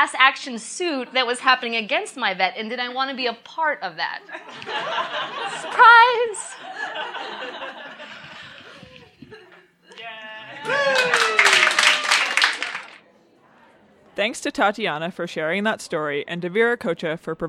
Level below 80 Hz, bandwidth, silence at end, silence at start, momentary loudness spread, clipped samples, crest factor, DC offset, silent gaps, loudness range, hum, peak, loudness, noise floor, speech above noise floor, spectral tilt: -66 dBFS; 15.5 kHz; 0 s; 0 s; 21 LU; under 0.1%; 22 dB; under 0.1%; none; 15 LU; none; 0 dBFS; -20 LUFS; -55 dBFS; 34 dB; -2 dB/octave